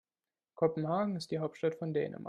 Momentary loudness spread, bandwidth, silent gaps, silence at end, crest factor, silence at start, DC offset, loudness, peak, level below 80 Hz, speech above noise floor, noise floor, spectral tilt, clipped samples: 4 LU; 11.5 kHz; none; 0 s; 20 dB; 0.6 s; under 0.1%; -34 LUFS; -16 dBFS; -76 dBFS; over 56 dB; under -90 dBFS; -7.5 dB/octave; under 0.1%